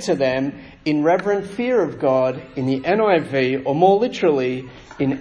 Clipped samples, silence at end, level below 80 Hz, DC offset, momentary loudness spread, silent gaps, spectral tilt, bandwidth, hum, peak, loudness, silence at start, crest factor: under 0.1%; 0 s; -54 dBFS; under 0.1%; 9 LU; none; -6.5 dB/octave; 10.5 kHz; none; -2 dBFS; -19 LUFS; 0 s; 18 dB